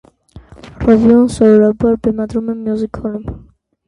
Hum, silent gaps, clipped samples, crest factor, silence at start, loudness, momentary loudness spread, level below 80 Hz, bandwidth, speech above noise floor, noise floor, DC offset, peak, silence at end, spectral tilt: none; none; under 0.1%; 14 dB; 0.35 s; -13 LUFS; 14 LU; -36 dBFS; 11 kHz; 28 dB; -40 dBFS; under 0.1%; 0 dBFS; 0.5 s; -8 dB/octave